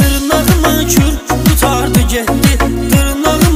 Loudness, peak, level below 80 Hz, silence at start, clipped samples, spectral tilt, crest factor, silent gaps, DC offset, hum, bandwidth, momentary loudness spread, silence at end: -11 LUFS; 0 dBFS; -18 dBFS; 0 s; under 0.1%; -4.5 dB/octave; 10 dB; none; under 0.1%; none; 16.5 kHz; 3 LU; 0 s